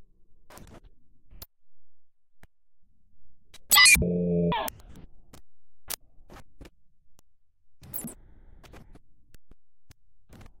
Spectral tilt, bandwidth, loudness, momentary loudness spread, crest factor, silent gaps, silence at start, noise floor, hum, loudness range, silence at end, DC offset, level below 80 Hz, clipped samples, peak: -2 dB/octave; 16.5 kHz; -22 LUFS; 22 LU; 26 dB; none; 0 s; -59 dBFS; none; 22 LU; 0.15 s; under 0.1%; -50 dBFS; under 0.1%; -4 dBFS